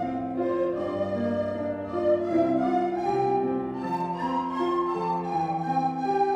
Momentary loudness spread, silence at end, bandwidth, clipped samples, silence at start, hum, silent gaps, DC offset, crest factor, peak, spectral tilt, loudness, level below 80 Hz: 6 LU; 0 s; 8.6 kHz; under 0.1%; 0 s; none; none; under 0.1%; 14 dB; -12 dBFS; -8 dB/octave; -27 LUFS; -60 dBFS